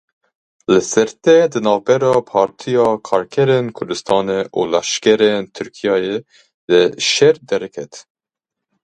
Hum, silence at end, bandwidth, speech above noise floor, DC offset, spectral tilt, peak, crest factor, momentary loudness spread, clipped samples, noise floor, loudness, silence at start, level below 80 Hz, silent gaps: none; 0.8 s; 10.5 kHz; 68 dB; under 0.1%; -4 dB/octave; 0 dBFS; 16 dB; 11 LU; under 0.1%; -83 dBFS; -16 LUFS; 0.7 s; -58 dBFS; 6.54-6.68 s